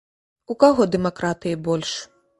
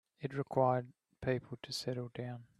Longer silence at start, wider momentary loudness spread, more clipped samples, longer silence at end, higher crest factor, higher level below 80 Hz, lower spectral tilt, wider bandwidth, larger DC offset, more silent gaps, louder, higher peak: first, 0.5 s vs 0.2 s; about the same, 13 LU vs 11 LU; neither; first, 0.35 s vs 0.15 s; about the same, 22 dB vs 22 dB; first, -54 dBFS vs -68 dBFS; about the same, -5.5 dB/octave vs -6 dB/octave; second, 11.5 kHz vs 13.5 kHz; neither; neither; first, -21 LUFS vs -38 LUFS; first, 0 dBFS vs -16 dBFS